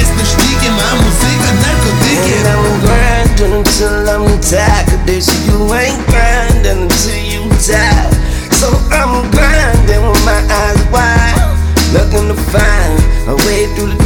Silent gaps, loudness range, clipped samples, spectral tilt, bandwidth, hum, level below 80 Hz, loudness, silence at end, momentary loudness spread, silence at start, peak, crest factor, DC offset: none; 1 LU; under 0.1%; -4.5 dB/octave; 19 kHz; none; -12 dBFS; -10 LUFS; 0 s; 3 LU; 0 s; 0 dBFS; 8 dB; under 0.1%